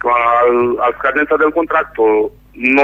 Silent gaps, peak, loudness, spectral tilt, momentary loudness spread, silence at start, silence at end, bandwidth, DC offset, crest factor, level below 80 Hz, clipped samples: none; 0 dBFS; -14 LUFS; -6.5 dB/octave; 5 LU; 0 s; 0 s; 3.9 kHz; under 0.1%; 12 dB; -46 dBFS; under 0.1%